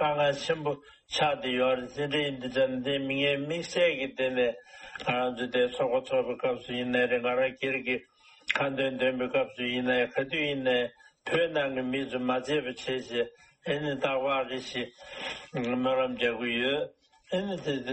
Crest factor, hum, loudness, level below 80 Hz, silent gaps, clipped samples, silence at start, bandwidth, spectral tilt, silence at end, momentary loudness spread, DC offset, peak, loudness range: 20 dB; none; -29 LUFS; -64 dBFS; none; under 0.1%; 0 s; 8.4 kHz; -5 dB/octave; 0 s; 8 LU; under 0.1%; -10 dBFS; 2 LU